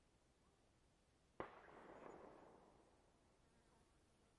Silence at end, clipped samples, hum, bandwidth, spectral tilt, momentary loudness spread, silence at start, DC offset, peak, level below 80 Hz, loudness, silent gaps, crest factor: 0 s; under 0.1%; none; 10.5 kHz; -5.5 dB/octave; 9 LU; 0 s; under 0.1%; -34 dBFS; -82 dBFS; -61 LUFS; none; 32 dB